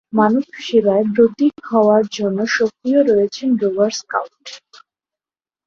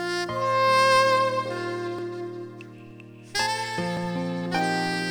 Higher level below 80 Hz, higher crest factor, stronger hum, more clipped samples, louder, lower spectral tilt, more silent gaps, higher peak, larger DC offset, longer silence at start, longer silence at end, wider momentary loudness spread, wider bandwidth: about the same, -60 dBFS vs -64 dBFS; about the same, 16 dB vs 16 dB; neither; neither; first, -16 LUFS vs -24 LUFS; first, -5.5 dB/octave vs -4 dB/octave; neither; first, -2 dBFS vs -10 dBFS; neither; first, 0.15 s vs 0 s; first, 1.1 s vs 0 s; second, 9 LU vs 21 LU; second, 7.4 kHz vs over 20 kHz